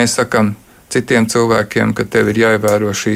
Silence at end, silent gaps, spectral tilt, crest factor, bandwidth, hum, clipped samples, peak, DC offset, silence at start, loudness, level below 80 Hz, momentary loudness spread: 0 s; none; -4.5 dB/octave; 12 dB; 16 kHz; none; under 0.1%; -2 dBFS; under 0.1%; 0 s; -14 LUFS; -48 dBFS; 7 LU